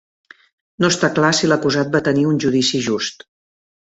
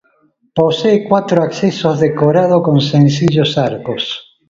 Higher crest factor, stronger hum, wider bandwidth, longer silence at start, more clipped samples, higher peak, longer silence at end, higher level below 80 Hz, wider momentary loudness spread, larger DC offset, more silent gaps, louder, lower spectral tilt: about the same, 18 dB vs 14 dB; neither; about the same, 8.2 kHz vs 7.6 kHz; first, 0.8 s vs 0.55 s; neither; about the same, -2 dBFS vs 0 dBFS; first, 0.85 s vs 0.3 s; second, -56 dBFS vs -50 dBFS; second, 6 LU vs 9 LU; neither; neither; second, -17 LUFS vs -13 LUFS; second, -4.5 dB/octave vs -7 dB/octave